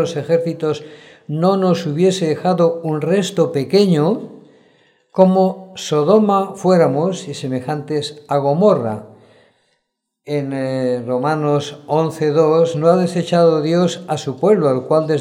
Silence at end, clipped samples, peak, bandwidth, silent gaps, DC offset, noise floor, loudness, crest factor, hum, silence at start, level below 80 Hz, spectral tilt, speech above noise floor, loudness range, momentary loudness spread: 0 s; under 0.1%; 0 dBFS; 14.5 kHz; none; under 0.1%; -73 dBFS; -17 LUFS; 16 dB; none; 0 s; -68 dBFS; -6.5 dB/octave; 57 dB; 5 LU; 10 LU